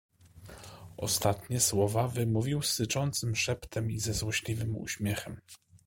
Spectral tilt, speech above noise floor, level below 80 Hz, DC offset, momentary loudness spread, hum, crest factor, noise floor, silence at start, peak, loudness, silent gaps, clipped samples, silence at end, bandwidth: -4 dB/octave; 21 dB; -54 dBFS; under 0.1%; 20 LU; none; 22 dB; -52 dBFS; 0.35 s; -10 dBFS; -31 LUFS; none; under 0.1%; 0.1 s; 16.5 kHz